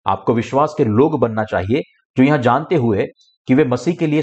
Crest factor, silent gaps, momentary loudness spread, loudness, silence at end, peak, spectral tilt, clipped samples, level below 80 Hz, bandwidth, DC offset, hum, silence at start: 14 dB; 2.05-2.14 s, 3.37-3.45 s; 7 LU; -17 LUFS; 0 s; -4 dBFS; -8 dB/octave; under 0.1%; -52 dBFS; 8.4 kHz; under 0.1%; none; 0.05 s